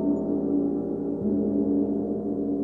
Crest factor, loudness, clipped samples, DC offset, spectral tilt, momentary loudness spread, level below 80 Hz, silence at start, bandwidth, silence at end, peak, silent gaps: 12 dB; -26 LUFS; under 0.1%; 0.1%; -13 dB/octave; 4 LU; -54 dBFS; 0 s; 1.8 kHz; 0 s; -14 dBFS; none